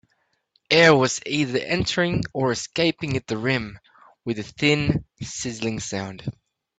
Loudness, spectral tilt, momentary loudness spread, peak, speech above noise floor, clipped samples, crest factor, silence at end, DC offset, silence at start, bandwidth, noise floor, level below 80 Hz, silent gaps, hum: -22 LUFS; -4.5 dB/octave; 16 LU; -2 dBFS; 47 dB; under 0.1%; 22 dB; 0.5 s; under 0.1%; 0.7 s; 9.2 kHz; -70 dBFS; -50 dBFS; none; none